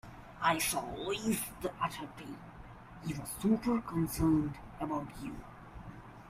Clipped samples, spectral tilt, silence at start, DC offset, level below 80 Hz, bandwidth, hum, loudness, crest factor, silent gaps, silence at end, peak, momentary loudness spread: under 0.1%; -5 dB/octave; 0.05 s; under 0.1%; -54 dBFS; 16 kHz; none; -35 LUFS; 18 dB; none; 0 s; -16 dBFS; 20 LU